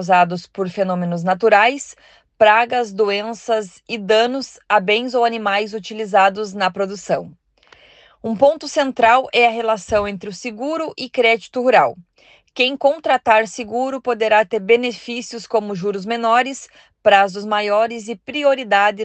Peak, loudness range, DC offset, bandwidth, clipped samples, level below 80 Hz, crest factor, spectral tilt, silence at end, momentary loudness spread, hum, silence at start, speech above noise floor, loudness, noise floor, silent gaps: 0 dBFS; 2 LU; under 0.1%; 8.8 kHz; under 0.1%; -58 dBFS; 18 dB; -4 dB/octave; 0 s; 12 LU; none; 0 s; 33 dB; -17 LUFS; -51 dBFS; none